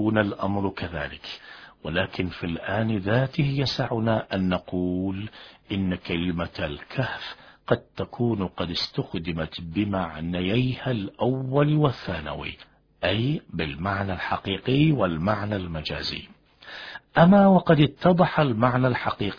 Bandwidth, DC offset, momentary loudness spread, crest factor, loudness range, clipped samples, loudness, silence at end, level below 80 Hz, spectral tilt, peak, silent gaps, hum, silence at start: 5.4 kHz; under 0.1%; 14 LU; 20 dB; 7 LU; under 0.1%; -25 LUFS; 0 s; -48 dBFS; -8 dB/octave; -4 dBFS; none; none; 0 s